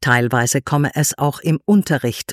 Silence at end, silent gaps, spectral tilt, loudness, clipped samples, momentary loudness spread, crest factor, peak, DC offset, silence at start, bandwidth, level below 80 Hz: 0 s; none; -5 dB/octave; -17 LUFS; under 0.1%; 5 LU; 16 dB; -2 dBFS; under 0.1%; 0 s; 16 kHz; -52 dBFS